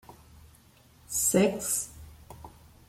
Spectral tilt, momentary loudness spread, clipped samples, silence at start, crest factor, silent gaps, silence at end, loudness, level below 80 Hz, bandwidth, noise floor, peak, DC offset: -4 dB/octave; 25 LU; under 0.1%; 0.1 s; 22 dB; none; 0.4 s; -27 LUFS; -56 dBFS; 16.5 kHz; -58 dBFS; -10 dBFS; under 0.1%